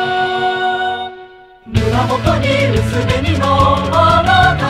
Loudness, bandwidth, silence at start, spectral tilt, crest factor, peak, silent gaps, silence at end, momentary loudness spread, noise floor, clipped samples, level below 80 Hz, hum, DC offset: -14 LUFS; 15 kHz; 0 s; -6 dB/octave; 14 dB; 0 dBFS; none; 0 s; 8 LU; -38 dBFS; under 0.1%; -30 dBFS; none; under 0.1%